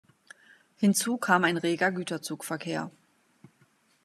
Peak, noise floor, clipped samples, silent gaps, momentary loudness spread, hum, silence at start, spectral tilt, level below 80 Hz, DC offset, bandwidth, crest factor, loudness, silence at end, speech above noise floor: -8 dBFS; -66 dBFS; under 0.1%; none; 11 LU; none; 0.8 s; -4 dB/octave; -80 dBFS; under 0.1%; 14 kHz; 22 dB; -28 LUFS; 1.15 s; 39 dB